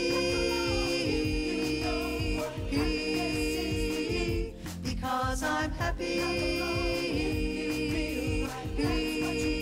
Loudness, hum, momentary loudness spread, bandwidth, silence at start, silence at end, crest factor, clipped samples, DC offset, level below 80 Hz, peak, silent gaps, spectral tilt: -30 LUFS; none; 4 LU; 16 kHz; 0 s; 0 s; 14 dB; under 0.1%; under 0.1%; -38 dBFS; -16 dBFS; none; -5 dB/octave